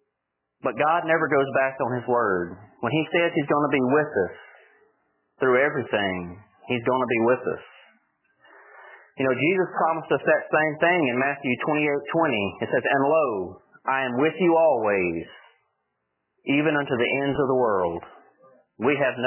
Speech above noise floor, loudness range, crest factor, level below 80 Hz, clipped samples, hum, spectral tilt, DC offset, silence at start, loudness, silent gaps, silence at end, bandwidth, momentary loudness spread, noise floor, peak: 58 dB; 3 LU; 16 dB; -60 dBFS; under 0.1%; none; -9.5 dB/octave; under 0.1%; 0.65 s; -23 LUFS; none; 0 s; 3.2 kHz; 10 LU; -80 dBFS; -8 dBFS